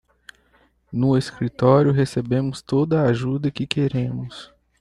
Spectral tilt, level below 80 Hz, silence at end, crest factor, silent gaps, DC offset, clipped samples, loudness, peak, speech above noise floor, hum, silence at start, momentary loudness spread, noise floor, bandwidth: -7.5 dB/octave; -52 dBFS; 0.35 s; 18 dB; none; under 0.1%; under 0.1%; -21 LUFS; -2 dBFS; 40 dB; none; 0.9 s; 12 LU; -60 dBFS; 11 kHz